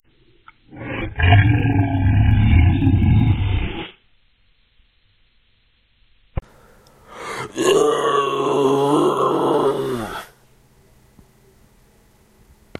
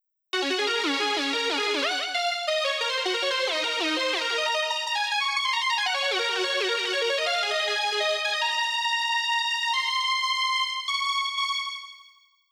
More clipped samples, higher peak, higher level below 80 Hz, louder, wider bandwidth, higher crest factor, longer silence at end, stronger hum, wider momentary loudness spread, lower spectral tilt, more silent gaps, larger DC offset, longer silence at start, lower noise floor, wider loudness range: neither; first, -2 dBFS vs -12 dBFS; first, -30 dBFS vs -78 dBFS; first, -18 LUFS vs -24 LUFS; second, 12.5 kHz vs over 20 kHz; about the same, 18 dB vs 14 dB; first, 2.55 s vs 0.5 s; neither; first, 18 LU vs 2 LU; first, -7 dB/octave vs 1 dB/octave; neither; neither; first, 0.75 s vs 0.35 s; about the same, -60 dBFS vs -57 dBFS; first, 14 LU vs 1 LU